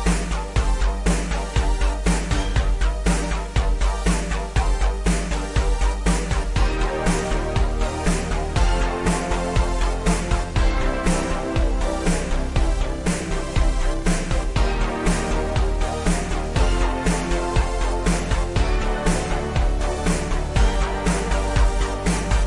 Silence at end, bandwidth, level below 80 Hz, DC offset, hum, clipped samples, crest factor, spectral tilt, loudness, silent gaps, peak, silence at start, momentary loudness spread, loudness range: 0 s; 11.5 kHz; -22 dBFS; 0.4%; none; under 0.1%; 14 dB; -5 dB/octave; -23 LUFS; none; -6 dBFS; 0 s; 2 LU; 1 LU